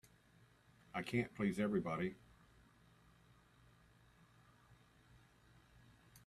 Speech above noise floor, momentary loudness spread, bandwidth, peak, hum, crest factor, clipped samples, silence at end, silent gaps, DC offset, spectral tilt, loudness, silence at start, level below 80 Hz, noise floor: 30 dB; 16 LU; 13.5 kHz; -24 dBFS; none; 22 dB; under 0.1%; 0.1 s; none; under 0.1%; -7 dB/octave; -41 LUFS; 0.95 s; -72 dBFS; -70 dBFS